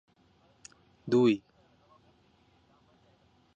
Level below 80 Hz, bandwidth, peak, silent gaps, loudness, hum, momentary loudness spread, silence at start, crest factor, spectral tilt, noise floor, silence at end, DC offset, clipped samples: -74 dBFS; 8.4 kHz; -14 dBFS; none; -27 LUFS; none; 29 LU; 1.05 s; 20 dB; -7 dB/octave; -66 dBFS; 2.2 s; under 0.1%; under 0.1%